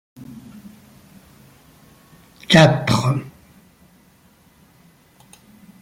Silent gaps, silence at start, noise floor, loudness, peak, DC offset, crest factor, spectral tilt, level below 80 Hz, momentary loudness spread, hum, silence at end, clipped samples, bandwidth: none; 0.2 s; -54 dBFS; -16 LUFS; 0 dBFS; under 0.1%; 22 dB; -5.5 dB/octave; -54 dBFS; 29 LU; none; 2.55 s; under 0.1%; 16 kHz